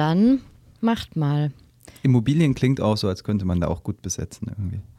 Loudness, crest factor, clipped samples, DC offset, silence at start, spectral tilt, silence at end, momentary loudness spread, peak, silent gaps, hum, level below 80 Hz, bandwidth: -23 LUFS; 14 dB; under 0.1%; under 0.1%; 0 s; -6.5 dB/octave; 0.15 s; 11 LU; -8 dBFS; none; none; -46 dBFS; 13.5 kHz